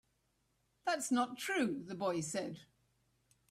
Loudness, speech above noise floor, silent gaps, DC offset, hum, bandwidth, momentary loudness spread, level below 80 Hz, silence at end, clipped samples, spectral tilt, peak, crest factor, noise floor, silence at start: -38 LUFS; 42 dB; none; under 0.1%; none; 15 kHz; 8 LU; -78 dBFS; 0.85 s; under 0.1%; -4 dB/octave; -22 dBFS; 18 dB; -79 dBFS; 0.85 s